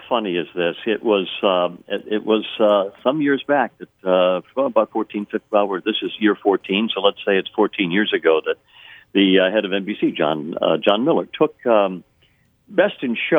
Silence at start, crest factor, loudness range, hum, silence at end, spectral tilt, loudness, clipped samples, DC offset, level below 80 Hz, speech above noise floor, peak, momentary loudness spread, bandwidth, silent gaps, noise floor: 0.05 s; 18 dB; 2 LU; none; 0 s; -7.5 dB/octave; -19 LUFS; under 0.1%; under 0.1%; -68 dBFS; 40 dB; 0 dBFS; 7 LU; 3.9 kHz; none; -59 dBFS